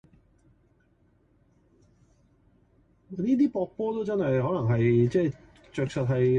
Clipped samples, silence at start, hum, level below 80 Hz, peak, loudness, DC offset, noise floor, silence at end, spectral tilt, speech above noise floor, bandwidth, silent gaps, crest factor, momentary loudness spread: under 0.1%; 3.1 s; none; -58 dBFS; -12 dBFS; -26 LUFS; under 0.1%; -65 dBFS; 0 s; -9 dB/octave; 40 dB; 8.6 kHz; none; 16 dB; 10 LU